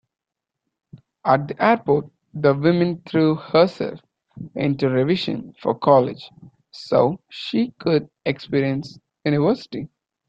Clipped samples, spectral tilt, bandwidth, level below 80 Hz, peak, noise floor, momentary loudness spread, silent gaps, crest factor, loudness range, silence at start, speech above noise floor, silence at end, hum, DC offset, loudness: under 0.1%; -8 dB/octave; 7.8 kHz; -60 dBFS; -2 dBFS; -85 dBFS; 15 LU; none; 20 dB; 3 LU; 1.25 s; 65 dB; 0.45 s; none; under 0.1%; -21 LUFS